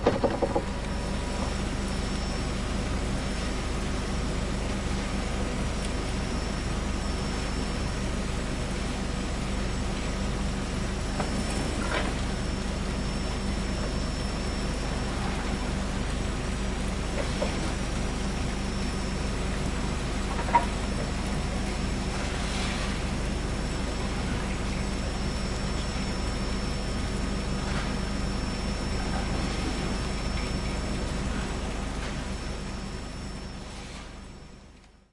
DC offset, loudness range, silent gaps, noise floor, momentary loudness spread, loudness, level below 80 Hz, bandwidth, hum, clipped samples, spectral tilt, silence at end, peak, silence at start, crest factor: under 0.1%; 2 LU; none; -52 dBFS; 2 LU; -31 LUFS; -34 dBFS; 11.5 kHz; none; under 0.1%; -5 dB/octave; 0.25 s; -8 dBFS; 0 s; 20 dB